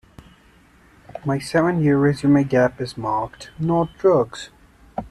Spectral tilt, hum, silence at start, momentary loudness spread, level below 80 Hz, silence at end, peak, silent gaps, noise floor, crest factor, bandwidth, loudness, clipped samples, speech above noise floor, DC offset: -7.5 dB/octave; none; 1.15 s; 17 LU; -50 dBFS; 0 s; -4 dBFS; none; -53 dBFS; 16 dB; 12 kHz; -20 LUFS; under 0.1%; 33 dB; under 0.1%